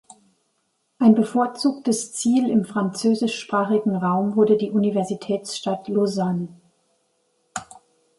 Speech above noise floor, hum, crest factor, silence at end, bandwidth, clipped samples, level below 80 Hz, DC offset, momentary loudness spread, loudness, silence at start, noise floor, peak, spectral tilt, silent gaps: 50 dB; none; 18 dB; 0.55 s; 11.5 kHz; under 0.1%; -68 dBFS; under 0.1%; 8 LU; -21 LUFS; 1 s; -71 dBFS; -4 dBFS; -5.5 dB/octave; none